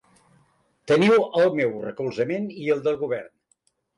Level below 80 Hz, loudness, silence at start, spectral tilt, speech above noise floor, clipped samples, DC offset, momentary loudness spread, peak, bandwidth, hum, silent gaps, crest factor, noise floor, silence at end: -68 dBFS; -23 LUFS; 0.85 s; -6.5 dB/octave; 46 dB; under 0.1%; under 0.1%; 12 LU; -10 dBFS; 11 kHz; none; none; 14 dB; -68 dBFS; 0.7 s